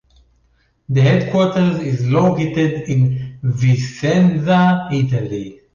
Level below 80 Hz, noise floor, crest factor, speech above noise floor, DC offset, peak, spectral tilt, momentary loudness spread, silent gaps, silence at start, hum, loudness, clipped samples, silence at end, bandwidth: -48 dBFS; -59 dBFS; 12 dB; 44 dB; under 0.1%; -4 dBFS; -7.5 dB/octave; 7 LU; none; 0.9 s; none; -16 LUFS; under 0.1%; 0.2 s; 7.2 kHz